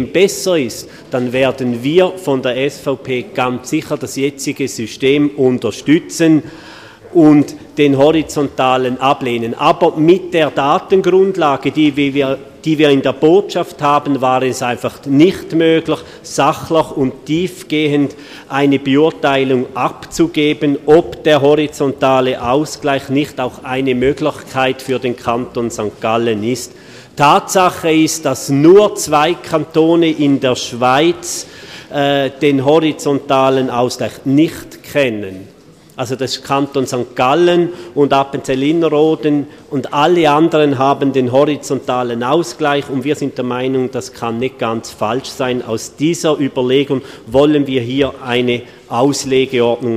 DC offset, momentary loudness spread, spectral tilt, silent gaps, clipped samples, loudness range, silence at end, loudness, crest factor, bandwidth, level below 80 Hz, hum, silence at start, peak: under 0.1%; 9 LU; -5 dB/octave; none; under 0.1%; 5 LU; 0 s; -14 LUFS; 14 dB; 15 kHz; -48 dBFS; none; 0 s; 0 dBFS